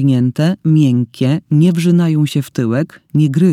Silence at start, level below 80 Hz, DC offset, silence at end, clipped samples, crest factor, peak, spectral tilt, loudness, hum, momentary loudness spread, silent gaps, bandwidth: 0 s; -56 dBFS; under 0.1%; 0 s; under 0.1%; 12 dB; -2 dBFS; -8 dB/octave; -14 LUFS; none; 6 LU; none; 14 kHz